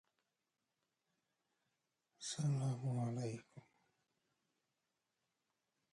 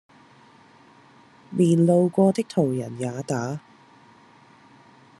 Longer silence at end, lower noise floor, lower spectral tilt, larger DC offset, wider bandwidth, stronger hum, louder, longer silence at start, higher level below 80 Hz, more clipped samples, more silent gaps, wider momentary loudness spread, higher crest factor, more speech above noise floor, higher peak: first, 2.35 s vs 1.6 s; first, -90 dBFS vs -53 dBFS; second, -6 dB/octave vs -7.5 dB/octave; neither; about the same, 11.5 kHz vs 12 kHz; neither; second, -42 LUFS vs -22 LUFS; first, 2.2 s vs 1.5 s; second, -86 dBFS vs -70 dBFS; neither; neither; second, 10 LU vs 14 LU; about the same, 18 dB vs 18 dB; first, 50 dB vs 32 dB; second, -30 dBFS vs -6 dBFS